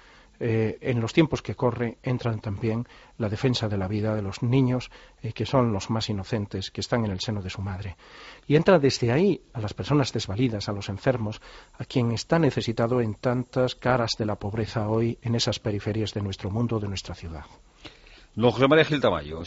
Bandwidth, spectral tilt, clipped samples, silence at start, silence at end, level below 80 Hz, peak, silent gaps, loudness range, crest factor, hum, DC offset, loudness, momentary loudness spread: 8 kHz; -5.5 dB/octave; under 0.1%; 0.4 s; 0 s; -50 dBFS; -6 dBFS; none; 4 LU; 20 dB; none; under 0.1%; -26 LUFS; 12 LU